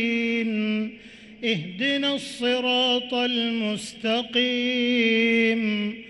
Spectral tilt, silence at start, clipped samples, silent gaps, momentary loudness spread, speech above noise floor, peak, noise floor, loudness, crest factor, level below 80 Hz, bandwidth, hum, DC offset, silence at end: -4 dB/octave; 0 s; under 0.1%; none; 7 LU; 21 dB; -10 dBFS; -45 dBFS; -23 LUFS; 14 dB; -64 dBFS; 11.5 kHz; none; under 0.1%; 0 s